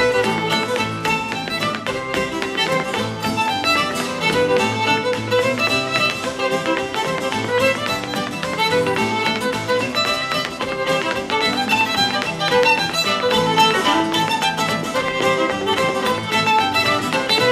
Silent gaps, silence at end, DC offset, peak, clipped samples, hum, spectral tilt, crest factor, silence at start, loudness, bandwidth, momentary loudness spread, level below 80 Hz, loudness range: none; 0 s; under 0.1%; -2 dBFS; under 0.1%; none; -3.5 dB/octave; 18 dB; 0 s; -18 LUFS; 15.5 kHz; 6 LU; -50 dBFS; 3 LU